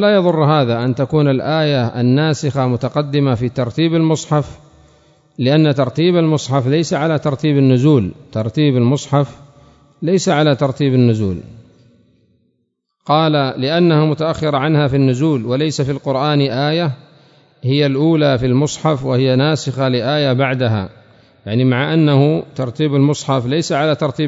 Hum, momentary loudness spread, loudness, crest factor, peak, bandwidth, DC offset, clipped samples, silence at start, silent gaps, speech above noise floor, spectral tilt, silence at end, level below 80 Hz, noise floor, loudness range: none; 6 LU; -15 LUFS; 14 dB; 0 dBFS; 8 kHz; under 0.1%; under 0.1%; 0 s; none; 54 dB; -6.5 dB/octave; 0 s; -50 dBFS; -68 dBFS; 3 LU